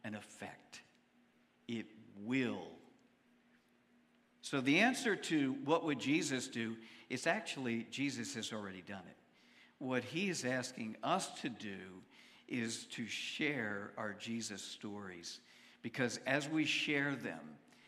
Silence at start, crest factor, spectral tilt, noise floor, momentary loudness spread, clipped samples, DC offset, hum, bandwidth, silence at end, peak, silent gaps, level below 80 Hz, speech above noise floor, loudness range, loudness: 0.05 s; 24 dB; -4 dB/octave; -72 dBFS; 16 LU; under 0.1%; under 0.1%; none; 14.5 kHz; 0.3 s; -16 dBFS; none; -88 dBFS; 33 dB; 9 LU; -39 LUFS